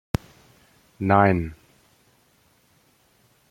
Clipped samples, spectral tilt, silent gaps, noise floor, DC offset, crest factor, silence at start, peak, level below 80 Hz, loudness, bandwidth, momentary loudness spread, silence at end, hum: under 0.1%; -8 dB/octave; none; -62 dBFS; under 0.1%; 24 dB; 1 s; -2 dBFS; -48 dBFS; -22 LUFS; 16.5 kHz; 14 LU; 1.95 s; none